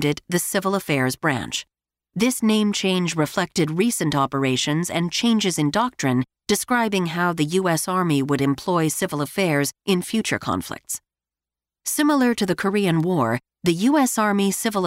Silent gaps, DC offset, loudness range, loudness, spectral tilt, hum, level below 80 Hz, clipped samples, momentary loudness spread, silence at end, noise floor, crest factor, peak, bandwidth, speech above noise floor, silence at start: none; under 0.1%; 2 LU; -21 LUFS; -4.5 dB/octave; none; -58 dBFS; under 0.1%; 5 LU; 0 s; under -90 dBFS; 14 dB; -6 dBFS; 16 kHz; over 69 dB; 0 s